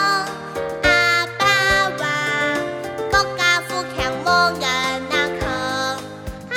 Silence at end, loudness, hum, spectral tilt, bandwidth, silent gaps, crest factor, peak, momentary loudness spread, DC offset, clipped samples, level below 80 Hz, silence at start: 0 s; -19 LUFS; none; -3 dB/octave; 19.5 kHz; none; 18 dB; -2 dBFS; 12 LU; under 0.1%; under 0.1%; -40 dBFS; 0 s